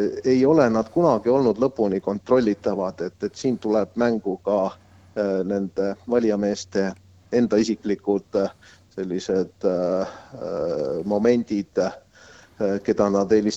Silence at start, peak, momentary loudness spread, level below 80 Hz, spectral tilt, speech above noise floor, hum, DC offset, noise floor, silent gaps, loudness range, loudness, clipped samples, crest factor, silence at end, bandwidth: 0 s; -4 dBFS; 9 LU; -56 dBFS; -6.5 dB/octave; 28 dB; none; under 0.1%; -50 dBFS; none; 4 LU; -23 LUFS; under 0.1%; 18 dB; 0 s; 8.2 kHz